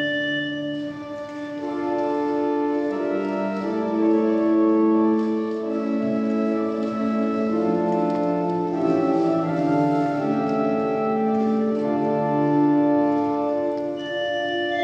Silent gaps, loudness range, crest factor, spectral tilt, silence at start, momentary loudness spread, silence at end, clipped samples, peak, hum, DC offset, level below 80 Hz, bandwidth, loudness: none; 3 LU; 12 dB; -7.5 dB/octave; 0 s; 7 LU; 0 s; under 0.1%; -8 dBFS; none; under 0.1%; -64 dBFS; 7.6 kHz; -22 LUFS